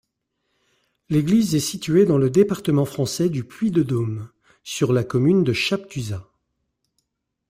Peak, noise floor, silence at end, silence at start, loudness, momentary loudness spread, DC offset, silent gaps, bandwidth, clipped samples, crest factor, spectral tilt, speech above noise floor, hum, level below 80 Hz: -4 dBFS; -77 dBFS; 1.3 s; 1.1 s; -21 LUFS; 14 LU; under 0.1%; none; 16 kHz; under 0.1%; 18 dB; -6 dB/octave; 57 dB; none; -54 dBFS